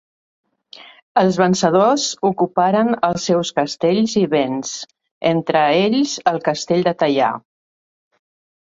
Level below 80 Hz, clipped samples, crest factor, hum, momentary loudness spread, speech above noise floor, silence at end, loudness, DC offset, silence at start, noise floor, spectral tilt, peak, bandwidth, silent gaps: -60 dBFS; under 0.1%; 18 dB; none; 7 LU; 27 dB; 1.25 s; -17 LUFS; under 0.1%; 1.15 s; -43 dBFS; -5 dB/octave; 0 dBFS; 8 kHz; 5.11-5.21 s